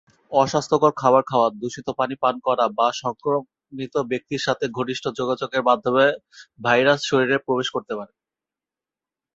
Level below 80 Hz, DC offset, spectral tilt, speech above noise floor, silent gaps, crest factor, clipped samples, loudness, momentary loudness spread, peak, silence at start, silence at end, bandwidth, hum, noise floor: -64 dBFS; under 0.1%; -4.5 dB/octave; 68 dB; none; 20 dB; under 0.1%; -21 LUFS; 11 LU; -2 dBFS; 0.3 s; 1.3 s; 8 kHz; none; -90 dBFS